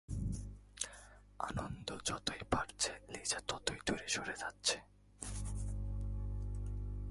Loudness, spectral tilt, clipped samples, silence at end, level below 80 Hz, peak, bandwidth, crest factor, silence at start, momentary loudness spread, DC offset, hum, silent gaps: -41 LUFS; -3 dB/octave; under 0.1%; 0 s; -48 dBFS; -18 dBFS; 11.5 kHz; 24 dB; 0.1 s; 8 LU; under 0.1%; 50 Hz at -55 dBFS; none